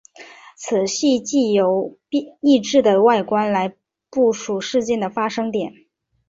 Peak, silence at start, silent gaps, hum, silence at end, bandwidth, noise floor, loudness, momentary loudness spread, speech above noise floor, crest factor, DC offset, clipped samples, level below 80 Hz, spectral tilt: -4 dBFS; 0.2 s; none; none; 0.55 s; 7.8 kHz; -43 dBFS; -19 LUFS; 10 LU; 25 dB; 16 dB; under 0.1%; under 0.1%; -62 dBFS; -4.5 dB/octave